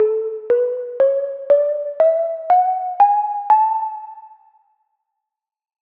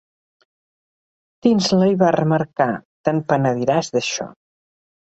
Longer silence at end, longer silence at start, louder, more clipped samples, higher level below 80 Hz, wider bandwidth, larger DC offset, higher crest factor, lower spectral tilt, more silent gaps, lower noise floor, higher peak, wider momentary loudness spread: first, 1.7 s vs 0.7 s; second, 0 s vs 1.45 s; about the same, -18 LUFS vs -19 LUFS; neither; second, -76 dBFS vs -60 dBFS; second, 4.2 kHz vs 8.2 kHz; neither; about the same, 14 dB vs 18 dB; about the same, -6 dB/octave vs -5.5 dB/octave; second, none vs 2.85-3.04 s; second, -83 dBFS vs under -90 dBFS; about the same, -4 dBFS vs -2 dBFS; about the same, 8 LU vs 8 LU